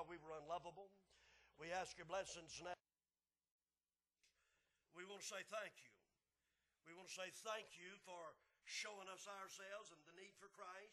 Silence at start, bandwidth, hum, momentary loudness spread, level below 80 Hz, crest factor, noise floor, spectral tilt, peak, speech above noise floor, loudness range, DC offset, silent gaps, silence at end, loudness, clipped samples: 0 s; 12.5 kHz; none; 14 LU; -86 dBFS; 22 dB; under -90 dBFS; -1.5 dB/octave; -34 dBFS; over 35 dB; 4 LU; under 0.1%; 3.51-3.59 s; 0 s; -54 LUFS; under 0.1%